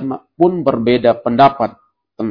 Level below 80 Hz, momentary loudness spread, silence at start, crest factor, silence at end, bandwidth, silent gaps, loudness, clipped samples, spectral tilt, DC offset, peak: -52 dBFS; 11 LU; 0 s; 16 dB; 0 s; 5.4 kHz; none; -14 LUFS; 0.2%; -9 dB/octave; under 0.1%; 0 dBFS